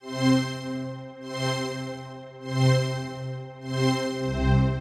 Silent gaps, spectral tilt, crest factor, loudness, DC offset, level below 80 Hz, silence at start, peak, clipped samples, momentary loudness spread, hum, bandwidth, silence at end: none; -6 dB/octave; 16 dB; -27 LUFS; under 0.1%; -38 dBFS; 0.05 s; -10 dBFS; under 0.1%; 14 LU; none; 12 kHz; 0 s